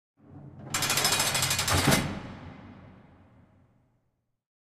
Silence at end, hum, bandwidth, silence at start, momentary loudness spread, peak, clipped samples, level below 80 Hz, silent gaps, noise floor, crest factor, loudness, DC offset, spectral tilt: 1.8 s; none; 15.5 kHz; 0.3 s; 23 LU; -8 dBFS; under 0.1%; -50 dBFS; none; -76 dBFS; 22 dB; -25 LUFS; under 0.1%; -2.5 dB/octave